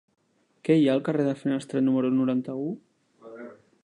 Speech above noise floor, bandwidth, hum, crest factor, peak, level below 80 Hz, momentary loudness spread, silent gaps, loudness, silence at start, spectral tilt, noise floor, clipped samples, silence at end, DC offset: 24 dB; 10.5 kHz; none; 18 dB; -8 dBFS; -80 dBFS; 22 LU; none; -25 LUFS; 0.65 s; -7.5 dB/octave; -48 dBFS; under 0.1%; 0.3 s; under 0.1%